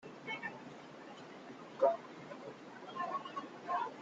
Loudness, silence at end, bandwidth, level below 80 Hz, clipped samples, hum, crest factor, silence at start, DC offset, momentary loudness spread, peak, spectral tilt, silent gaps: -41 LUFS; 0 s; 7.8 kHz; -86 dBFS; under 0.1%; none; 24 dB; 0 s; under 0.1%; 18 LU; -18 dBFS; -5 dB/octave; none